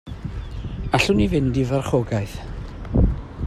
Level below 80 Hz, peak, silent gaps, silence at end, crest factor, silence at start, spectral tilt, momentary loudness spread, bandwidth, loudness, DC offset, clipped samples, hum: -30 dBFS; -4 dBFS; none; 0 s; 18 dB; 0.05 s; -6.5 dB/octave; 15 LU; 14 kHz; -22 LUFS; under 0.1%; under 0.1%; none